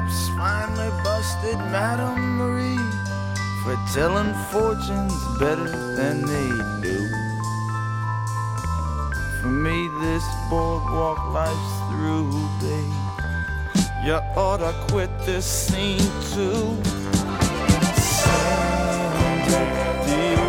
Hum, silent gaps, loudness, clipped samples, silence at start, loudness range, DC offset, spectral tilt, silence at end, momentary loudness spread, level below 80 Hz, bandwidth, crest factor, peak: none; none; -23 LUFS; under 0.1%; 0 s; 4 LU; under 0.1%; -5 dB/octave; 0 s; 6 LU; -32 dBFS; 17 kHz; 20 dB; -2 dBFS